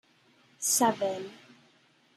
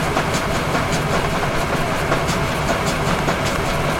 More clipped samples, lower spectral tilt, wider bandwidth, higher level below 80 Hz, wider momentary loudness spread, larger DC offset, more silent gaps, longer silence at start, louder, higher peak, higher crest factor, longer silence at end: neither; second, -2 dB/octave vs -4.5 dB/octave; second, 14 kHz vs 17 kHz; second, -82 dBFS vs -30 dBFS; first, 15 LU vs 1 LU; neither; neither; first, 0.6 s vs 0 s; second, -28 LUFS vs -20 LUFS; second, -10 dBFS vs -4 dBFS; first, 22 dB vs 14 dB; first, 0.8 s vs 0 s